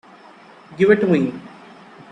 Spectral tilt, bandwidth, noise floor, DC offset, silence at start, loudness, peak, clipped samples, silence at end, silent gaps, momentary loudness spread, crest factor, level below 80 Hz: -8 dB/octave; 9 kHz; -45 dBFS; under 0.1%; 0.7 s; -17 LUFS; -2 dBFS; under 0.1%; 0.65 s; none; 22 LU; 18 dB; -62 dBFS